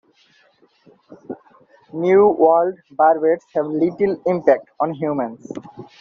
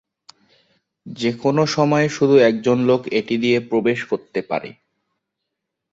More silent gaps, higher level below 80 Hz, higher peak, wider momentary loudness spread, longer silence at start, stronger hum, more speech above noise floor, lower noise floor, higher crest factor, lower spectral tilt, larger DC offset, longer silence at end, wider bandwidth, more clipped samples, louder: neither; about the same, -64 dBFS vs -62 dBFS; about the same, -2 dBFS vs -2 dBFS; first, 20 LU vs 11 LU; about the same, 1.1 s vs 1.05 s; neither; second, 40 dB vs 62 dB; second, -57 dBFS vs -80 dBFS; about the same, 18 dB vs 18 dB; about the same, -7 dB/octave vs -6 dB/octave; neither; second, 0.15 s vs 1.2 s; second, 6.8 kHz vs 7.8 kHz; neither; about the same, -18 LUFS vs -18 LUFS